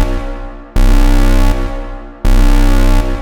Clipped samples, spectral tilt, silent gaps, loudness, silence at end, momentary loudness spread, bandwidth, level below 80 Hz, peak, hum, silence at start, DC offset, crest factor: under 0.1%; -6 dB/octave; none; -15 LUFS; 0 s; 14 LU; 13 kHz; -10 dBFS; 0 dBFS; none; 0 s; under 0.1%; 10 dB